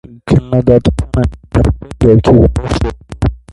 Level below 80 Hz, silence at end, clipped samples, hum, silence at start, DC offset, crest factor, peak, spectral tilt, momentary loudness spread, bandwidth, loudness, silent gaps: -20 dBFS; 0.15 s; under 0.1%; none; 0.1 s; under 0.1%; 12 dB; 0 dBFS; -8.5 dB/octave; 10 LU; 11.5 kHz; -12 LUFS; none